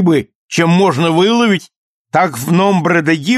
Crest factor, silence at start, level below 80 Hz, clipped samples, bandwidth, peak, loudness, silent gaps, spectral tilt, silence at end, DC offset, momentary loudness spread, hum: 12 dB; 0 s; -56 dBFS; under 0.1%; 13 kHz; -2 dBFS; -13 LUFS; 0.35-0.49 s, 1.76-2.05 s; -5.5 dB/octave; 0 s; under 0.1%; 6 LU; none